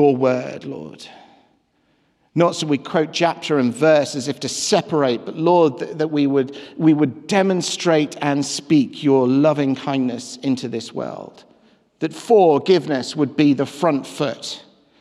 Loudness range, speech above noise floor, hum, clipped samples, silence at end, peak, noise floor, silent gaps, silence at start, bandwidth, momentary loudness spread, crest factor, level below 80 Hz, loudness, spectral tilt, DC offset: 3 LU; 45 dB; none; under 0.1%; 0.4 s; -4 dBFS; -63 dBFS; none; 0 s; 12.5 kHz; 12 LU; 16 dB; -70 dBFS; -19 LUFS; -5.5 dB/octave; under 0.1%